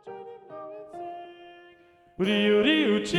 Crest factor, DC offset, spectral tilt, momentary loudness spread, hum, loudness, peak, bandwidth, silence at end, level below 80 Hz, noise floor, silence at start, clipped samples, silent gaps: 18 dB; under 0.1%; -5 dB/octave; 22 LU; none; -23 LUFS; -10 dBFS; 11.5 kHz; 0 s; -64 dBFS; -57 dBFS; 0.05 s; under 0.1%; none